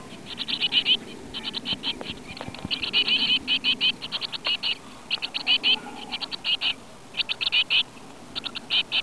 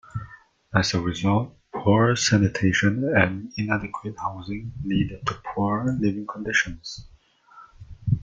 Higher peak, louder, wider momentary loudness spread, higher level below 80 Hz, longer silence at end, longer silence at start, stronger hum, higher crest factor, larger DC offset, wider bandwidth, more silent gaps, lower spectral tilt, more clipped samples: second, -10 dBFS vs -2 dBFS; about the same, -24 LUFS vs -24 LUFS; about the same, 14 LU vs 14 LU; second, -58 dBFS vs -48 dBFS; about the same, 0 s vs 0 s; second, 0 s vs 0.15 s; neither; about the same, 18 dB vs 22 dB; first, 0.4% vs under 0.1%; first, 11 kHz vs 8.6 kHz; neither; second, -2 dB/octave vs -5 dB/octave; neither